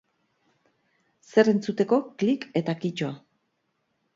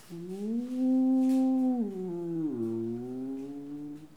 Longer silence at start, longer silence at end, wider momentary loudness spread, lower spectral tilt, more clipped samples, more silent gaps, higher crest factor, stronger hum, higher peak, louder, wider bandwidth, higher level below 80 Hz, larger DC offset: first, 1.35 s vs 0.1 s; first, 1 s vs 0.1 s; second, 11 LU vs 15 LU; second, -7 dB/octave vs -8.5 dB/octave; neither; neither; first, 22 dB vs 10 dB; neither; first, -6 dBFS vs -20 dBFS; first, -25 LUFS vs -30 LUFS; second, 7.6 kHz vs 10.5 kHz; about the same, -72 dBFS vs -72 dBFS; second, under 0.1% vs 0.1%